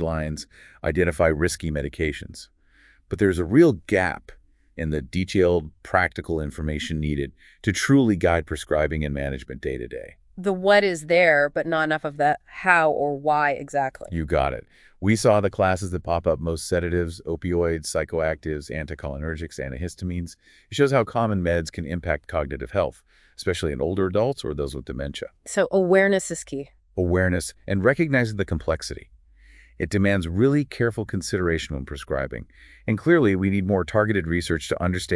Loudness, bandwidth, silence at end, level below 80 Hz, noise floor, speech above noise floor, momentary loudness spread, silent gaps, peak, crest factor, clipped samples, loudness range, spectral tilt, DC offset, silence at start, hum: -23 LUFS; 12 kHz; 0 s; -42 dBFS; -57 dBFS; 34 dB; 13 LU; none; -2 dBFS; 22 dB; under 0.1%; 5 LU; -6 dB/octave; under 0.1%; 0 s; none